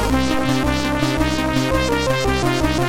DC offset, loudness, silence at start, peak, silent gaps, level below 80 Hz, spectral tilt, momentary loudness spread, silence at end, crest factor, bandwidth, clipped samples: under 0.1%; -19 LUFS; 0 s; -4 dBFS; none; -28 dBFS; -5 dB/octave; 1 LU; 0 s; 14 dB; 16.5 kHz; under 0.1%